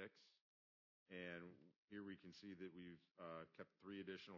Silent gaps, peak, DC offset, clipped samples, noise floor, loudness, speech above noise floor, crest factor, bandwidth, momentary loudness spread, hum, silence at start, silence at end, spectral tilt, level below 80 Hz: 0.41-1.06 s, 1.78-1.88 s; -40 dBFS; under 0.1%; under 0.1%; under -90 dBFS; -58 LUFS; over 33 dB; 18 dB; 6 kHz; 7 LU; none; 0 s; 0 s; -4 dB/octave; under -90 dBFS